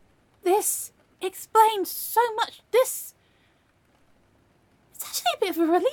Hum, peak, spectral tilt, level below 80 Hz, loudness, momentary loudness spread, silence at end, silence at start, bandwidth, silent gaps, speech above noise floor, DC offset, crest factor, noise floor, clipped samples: none; -6 dBFS; -1 dB/octave; -72 dBFS; -24 LUFS; 14 LU; 0 s; 0.45 s; 17.5 kHz; none; 40 dB; under 0.1%; 20 dB; -64 dBFS; under 0.1%